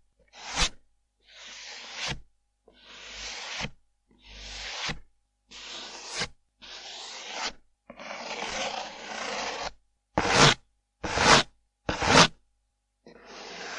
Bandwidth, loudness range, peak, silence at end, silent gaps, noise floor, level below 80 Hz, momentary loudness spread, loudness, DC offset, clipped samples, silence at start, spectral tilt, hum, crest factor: 12 kHz; 15 LU; -2 dBFS; 0 s; none; -76 dBFS; -48 dBFS; 24 LU; -26 LUFS; under 0.1%; under 0.1%; 0.35 s; -2.5 dB/octave; none; 28 dB